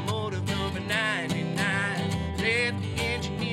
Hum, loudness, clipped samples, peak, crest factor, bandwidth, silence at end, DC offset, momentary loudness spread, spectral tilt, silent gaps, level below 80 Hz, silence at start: none; -27 LUFS; under 0.1%; -12 dBFS; 16 dB; 16 kHz; 0 s; under 0.1%; 4 LU; -5 dB/octave; none; -46 dBFS; 0 s